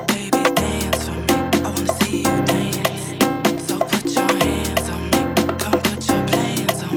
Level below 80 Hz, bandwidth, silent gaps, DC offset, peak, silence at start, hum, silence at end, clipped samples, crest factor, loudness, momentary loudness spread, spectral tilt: -40 dBFS; 19.5 kHz; none; under 0.1%; -2 dBFS; 0 s; none; 0 s; under 0.1%; 18 dB; -19 LUFS; 4 LU; -4 dB/octave